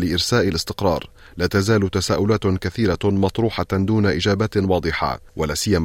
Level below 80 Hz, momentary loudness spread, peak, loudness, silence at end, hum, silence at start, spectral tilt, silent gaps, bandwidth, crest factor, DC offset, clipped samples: -42 dBFS; 6 LU; -6 dBFS; -20 LUFS; 0 s; none; 0 s; -5.5 dB/octave; none; 16.5 kHz; 14 dB; under 0.1%; under 0.1%